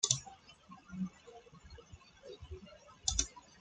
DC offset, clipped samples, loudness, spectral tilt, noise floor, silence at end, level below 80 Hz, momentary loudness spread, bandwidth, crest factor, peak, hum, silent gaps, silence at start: under 0.1%; under 0.1%; -38 LUFS; -2 dB/octave; -58 dBFS; 0 s; -54 dBFS; 23 LU; 10.5 kHz; 32 dB; -10 dBFS; none; none; 0 s